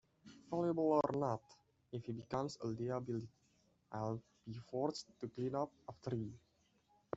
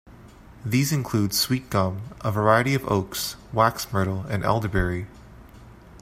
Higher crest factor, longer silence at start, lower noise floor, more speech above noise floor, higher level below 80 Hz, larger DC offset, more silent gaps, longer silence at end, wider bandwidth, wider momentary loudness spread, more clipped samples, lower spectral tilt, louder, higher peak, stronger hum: about the same, 22 dB vs 22 dB; first, 0.25 s vs 0.05 s; first, -76 dBFS vs -47 dBFS; first, 35 dB vs 23 dB; second, -74 dBFS vs -44 dBFS; neither; neither; first, 0.8 s vs 0.05 s; second, 8 kHz vs 16 kHz; first, 15 LU vs 9 LU; neither; first, -7 dB/octave vs -5 dB/octave; second, -42 LUFS vs -24 LUFS; second, -20 dBFS vs -4 dBFS; neither